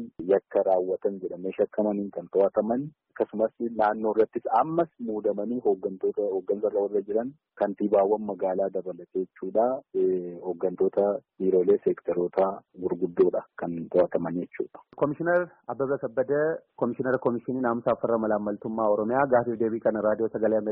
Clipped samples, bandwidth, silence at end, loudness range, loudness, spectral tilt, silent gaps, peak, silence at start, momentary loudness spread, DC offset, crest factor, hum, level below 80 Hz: under 0.1%; 4 kHz; 0 s; 2 LU; -27 LUFS; -7.5 dB/octave; none; -10 dBFS; 0 s; 8 LU; under 0.1%; 16 dB; none; -66 dBFS